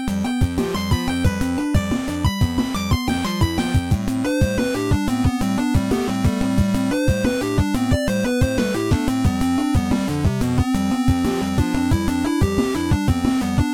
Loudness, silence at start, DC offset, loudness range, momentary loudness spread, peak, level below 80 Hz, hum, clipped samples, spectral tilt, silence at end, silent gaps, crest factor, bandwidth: -20 LUFS; 0 s; under 0.1%; 1 LU; 2 LU; -4 dBFS; -30 dBFS; none; under 0.1%; -6 dB/octave; 0 s; none; 14 dB; 17.5 kHz